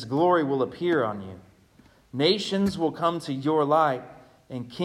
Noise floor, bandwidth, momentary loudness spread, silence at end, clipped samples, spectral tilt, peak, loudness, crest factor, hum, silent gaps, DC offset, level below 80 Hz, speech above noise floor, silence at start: -57 dBFS; 14 kHz; 16 LU; 0 s; under 0.1%; -6 dB/octave; -8 dBFS; -25 LUFS; 18 dB; none; none; under 0.1%; -62 dBFS; 33 dB; 0 s